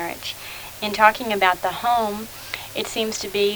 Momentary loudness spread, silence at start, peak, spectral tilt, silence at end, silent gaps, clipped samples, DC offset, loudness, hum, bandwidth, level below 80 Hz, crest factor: 14 LU; 0 s; 0 dBFS; -2.5 dB/octave; 0 s; none; under 0.1%; under 0.1%; -22 LUFS; none; over 20 kHz; -52 dBFS; 22 dB